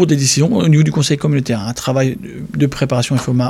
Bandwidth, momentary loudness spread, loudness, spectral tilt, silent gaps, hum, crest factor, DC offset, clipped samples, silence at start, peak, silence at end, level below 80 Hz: 13.5 kHz; 7 LU; -15 LUFS; -5.5 dB/octave; none; none; 14 dB; under 0.1%; under 0.1%; 0 s; -2 dBFS; 0 s; -44 dBFS